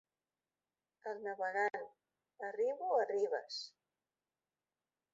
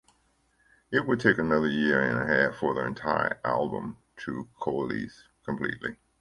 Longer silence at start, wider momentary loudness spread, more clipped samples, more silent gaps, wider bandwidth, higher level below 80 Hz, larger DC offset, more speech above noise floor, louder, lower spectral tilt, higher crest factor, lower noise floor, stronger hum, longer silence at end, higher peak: first, 1.05 s vs 0.9 s; about the same, 14 LU vs 13 LU; neither; neither; second, 7.6 kHz vs 11 kHz; second, under -90 dBFS vs -58 dBFS; neither; first, over 52 dB vs 41 dB; second, -39 LUFS vs -28 LUFS; second, 0.5 dB/octave vs -7 dB/octave; about the same, 20 dB vs 24 dB; first, under -90 dBFS vs -68 dBFS; neither; first, 1.45 s vs 0.25 s; second, -22 dBFS vs -4 dBFS